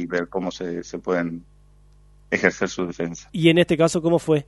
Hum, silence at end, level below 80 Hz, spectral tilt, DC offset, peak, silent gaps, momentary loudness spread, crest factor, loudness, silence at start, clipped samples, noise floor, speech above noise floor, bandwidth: 50 Hz at -50 dBFS; 0.05 s; -52 dBFS; -5.5 dB/octave; under 0.1%; 0 dBFS; none; 13 LU; 22 dB; -22 LUFS; 0 s; under 0.1%; -52 dBFS; 30 dB; 11.5 kHz